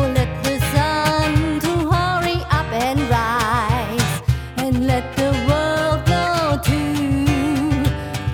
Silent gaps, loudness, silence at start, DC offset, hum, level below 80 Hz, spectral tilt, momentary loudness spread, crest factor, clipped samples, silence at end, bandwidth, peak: none; -19 LUFS; 0 s; under 0.1%; none; -30 dBFS; -5.5 dB/octave; 3 LU; 16 dB; under 0.1%; 0 s; 18.5 kHz; -2 dBFS